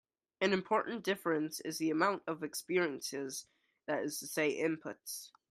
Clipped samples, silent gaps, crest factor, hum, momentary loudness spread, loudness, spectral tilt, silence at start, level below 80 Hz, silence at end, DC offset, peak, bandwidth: under 0.1%; none; 20 dB; none; 11 LU; -36 LUFS; -4 dB/octave; 0.4 s; -84 dBFS; 0.25 s; under 0.1%; -16 dBFS; 15.5 kHz